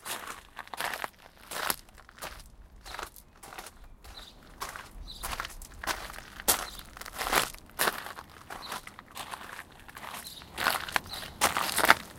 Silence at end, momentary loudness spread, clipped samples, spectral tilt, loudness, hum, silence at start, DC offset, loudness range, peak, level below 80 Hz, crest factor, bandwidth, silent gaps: 0 s; 20 LU; under 0.1%; -1 dB/octave; -32 LUFS; none; 0 s; under 0.1%; 10 LU; 0 dBFS; -52 dBFS; 34 dB; 17 kHz; none